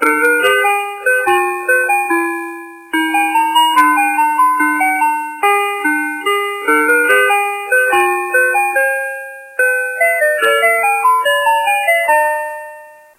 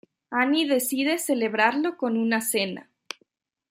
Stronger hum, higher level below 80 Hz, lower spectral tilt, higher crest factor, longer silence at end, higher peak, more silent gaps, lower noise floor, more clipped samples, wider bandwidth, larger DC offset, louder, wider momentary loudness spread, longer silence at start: neither; first, -66 dBFS vs -78 dBFS; second, -0.5 dB/octave vs -3 dB/octave; second, 14 dB vs 20 dB; second, 0.25 s vs 0.9 s; first, 0 dBFS vs -6 dBFS; neither; second, -36 dBFS vs -69 dBFS; neither; about the same, 16 kHz vs 16 kHz; neither; first, -13 LUFS vs -24 LUFS; second, 8 LU vs 18 LU; second, 0 s vs 0.3 s